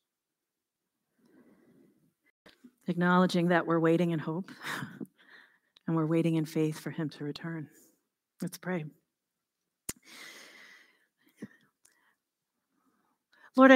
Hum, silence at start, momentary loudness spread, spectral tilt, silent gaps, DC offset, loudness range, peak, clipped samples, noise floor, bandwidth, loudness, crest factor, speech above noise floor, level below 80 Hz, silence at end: none; 2.9 s; 23 LU; -6.5 dB/octave; none; under 0.1%; 19 LU; -4 dBFS; under 0.1%; -88 dBFS; 16 kHz; -31 LUFS; 28 dB; 58 dB; -76 dBFS; 0 s